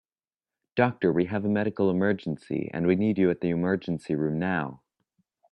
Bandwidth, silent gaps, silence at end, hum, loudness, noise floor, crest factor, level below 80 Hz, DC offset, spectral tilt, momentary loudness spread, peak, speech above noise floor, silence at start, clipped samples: 9 kHz; none; 0.75 s; none; -27 LUFS; under -90 dBFS; 20 dB; -64 dBFS; under 0.1%; -9 dB/octave; 7 LU; -6 dBFS; over 64 dB; 0.75 s; under 0.1%